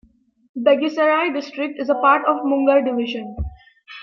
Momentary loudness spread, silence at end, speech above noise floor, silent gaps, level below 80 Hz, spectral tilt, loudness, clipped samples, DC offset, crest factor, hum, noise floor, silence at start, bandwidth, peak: 16 LU; 0 s; 24 dB; none; -42 dBFS; -6.5 dB/octave; -19 LUFS; under 0.1%; under 0.1%; 18 dB; none; -42 dBFS; 0.55 s; 6.4 kHz; -2 dBFS